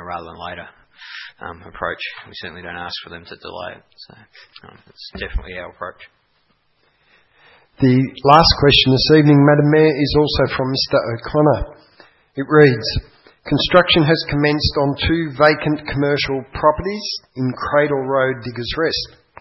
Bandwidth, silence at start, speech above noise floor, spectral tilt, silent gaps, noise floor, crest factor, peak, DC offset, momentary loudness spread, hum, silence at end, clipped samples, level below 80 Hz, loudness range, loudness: 6 kHz; 0 s; 45 dB; -6.5 dB/octave; none; -62 dBFS; 18 dB; 0 dBFS; under 0.1%; 21 LU; none; 0.35 s; under 0.1%; -36 dBFS; 20 LU; -16 LUFS